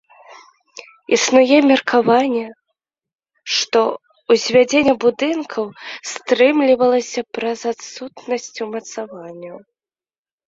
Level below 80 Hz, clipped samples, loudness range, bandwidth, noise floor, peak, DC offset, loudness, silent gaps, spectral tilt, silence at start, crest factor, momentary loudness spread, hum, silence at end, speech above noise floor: -60 dBFS; under 0.1%; 5 LU; 7.8 kHz; under -90 dBFS; -2 dBFS; under 0.1%; -17 LUFS; none; -3 dB/octave; 0.3 s; 16 dB; 19 LU; none; 0.9 s; over 73 dB